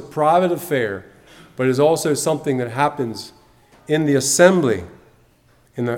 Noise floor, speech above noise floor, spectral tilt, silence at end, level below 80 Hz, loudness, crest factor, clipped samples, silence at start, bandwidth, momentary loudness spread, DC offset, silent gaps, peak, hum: -55 dBFS; 38 dB; -4.5 dB/octave; 0 s; -58 dBFS; -18 LUFS; 20 dB; under 0.1%; 0 s; 18 kHz; 17 LU; under 0.1%; none; 0 dBFS; none